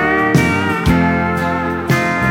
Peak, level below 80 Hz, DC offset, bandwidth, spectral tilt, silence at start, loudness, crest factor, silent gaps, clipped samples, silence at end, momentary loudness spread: -2 dBFS; -32 dBFS; under 0.1%; 17 kHz; -6.5 dB/octave; 0 s; -15 LUFS; 14 dB; none; under 0.1%; 0 s; 4 LU